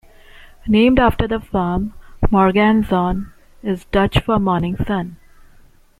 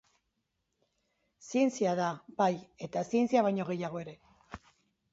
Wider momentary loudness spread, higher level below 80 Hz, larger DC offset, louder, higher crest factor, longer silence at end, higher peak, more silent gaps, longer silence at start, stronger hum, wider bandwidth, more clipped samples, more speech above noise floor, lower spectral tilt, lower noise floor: second, 14 LU vs 22 LU; first, -30 dBFS vs -70 dBFS; neither; first, -17 LUFS vs -31 LUFS; about the same, 16 dB vs 20 dB; first, 0.85 s vs 0.55 s; first, -2 dBFS vs -14 dBFS; neither; second, 0.65 s vs 1.45 s; neither; first, 14 kHz vs 8 kHz; neither; second, 31 dB vs 51 dB; first, -8 dB/octave vs -6 dB/octave; second, -47 dBFS vs -82 dBFS